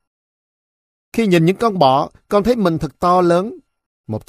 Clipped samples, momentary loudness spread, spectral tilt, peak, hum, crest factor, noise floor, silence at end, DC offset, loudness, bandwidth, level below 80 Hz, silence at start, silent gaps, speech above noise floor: under 0.1%; 8 LU; -7 dB/octave; 0 dBFS; none; 18 dB; under -90 dBFS; 0.1 s; under 0.1%; -16 LUFS; 15 kHz; -44 dBFS; 1.15 s; 3.86-4.04 s; over 75 dB